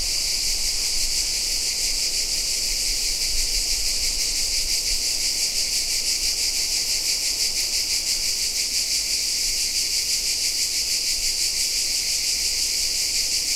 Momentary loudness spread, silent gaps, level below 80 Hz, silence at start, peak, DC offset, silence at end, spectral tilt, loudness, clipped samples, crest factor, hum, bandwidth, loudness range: 1 LU; none; -36 dBFS; 0 s; -8 dBFS; under 0.1%; 0 s; 2 dB/octave; -20 LUFS; under 0.1%; 14 dB; none; 16 kHz; 1 LU